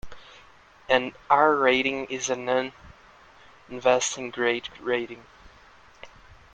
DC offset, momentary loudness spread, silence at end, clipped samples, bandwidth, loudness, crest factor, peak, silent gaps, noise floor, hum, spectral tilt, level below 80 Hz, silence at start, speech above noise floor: under 0.1%; 11 LU; 0.2 s; under 0.1%; 9.6 kHz; -24 LUFS; 22 dB; -4 dBFS; none; -53 dBFS; none; -2.5 dB/octave; -58 dBFS; 0.05 s; 29 dB